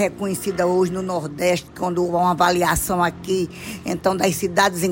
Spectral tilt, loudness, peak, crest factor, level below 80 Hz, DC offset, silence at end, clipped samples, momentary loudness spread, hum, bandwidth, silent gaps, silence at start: -4.5 dB/octave; -21 LUFS; -4 dBFS; 16 dB; -44 dBFS; under 0.1%; 0 s; under 0.1%; 8 LU; none; 16.5 kHz; none; 0 s